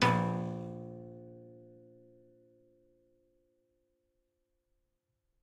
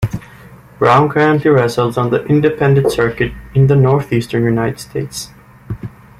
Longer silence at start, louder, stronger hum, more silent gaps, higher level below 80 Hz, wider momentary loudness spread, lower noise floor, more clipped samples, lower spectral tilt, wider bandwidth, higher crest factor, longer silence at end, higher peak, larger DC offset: about the same, 0 s vs 0 s; second, -36 LUFS vs -14 LUFS; neither; neither; second, -72 dBFS vs -40 dBFS; first, 26 LU vs 17 LU; first, -82 dBFS vs -39 dBFS; neither; about the same, -6 dB/octave vs -7 dB/octave; second, 12.5 kHz vs 14.5 kHz; first, 26 dB vs 14 dB; first, 3.65 s vs 0.3 s; second, -14 dBFS vs 0 dBFS; neither